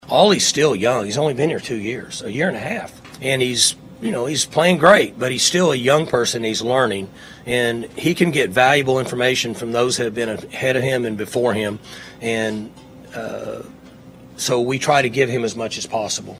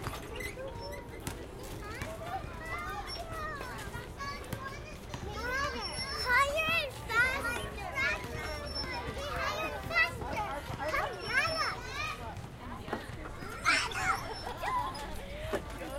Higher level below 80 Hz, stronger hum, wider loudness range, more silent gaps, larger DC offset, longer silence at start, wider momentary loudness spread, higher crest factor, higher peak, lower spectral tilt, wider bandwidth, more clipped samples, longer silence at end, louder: second, -54 dBFS vs -48 dBFS; neither; about the same, 7 LU vs 9 LU; neither; neither; about the same, 0.05 s vs 0 s; about the same, 14 LU vs 14 LU; about the same, 20 dB vs 22 dB; first, 0 dBFS vs -14 dBFS; about the same, -3.5 dB/octave vs -3.5 dB/octave; about the same, 16 kHz vs 16.5 kHz; neither; about the same, 0 s vs 0 s; first, -18 LUFS vs -34 LUFS